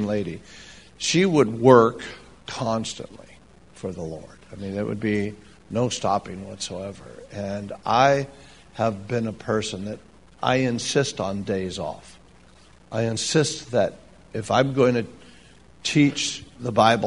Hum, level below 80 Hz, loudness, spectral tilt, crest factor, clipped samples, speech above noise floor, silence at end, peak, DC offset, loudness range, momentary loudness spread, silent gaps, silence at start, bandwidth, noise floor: none; -54 dBFS; -23 LUFS; -5 dB/octave; 24 dB; under 0.1%; 29 dB; 0 s; 0 dBFS; 0.2%; 7 LU; 18 LU; none; 0 s; 10.5 kHz; -52 dBFS